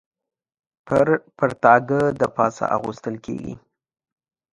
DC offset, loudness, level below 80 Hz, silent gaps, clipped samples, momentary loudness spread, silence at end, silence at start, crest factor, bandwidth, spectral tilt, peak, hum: under 0.1%; -20 LUFS; -56 dBFS; none; under 0.1%; 15 LU; 0.95 s; 0.85 s; 22 dB; 11 kHz; -7 dB/octave; 0 dBFS; none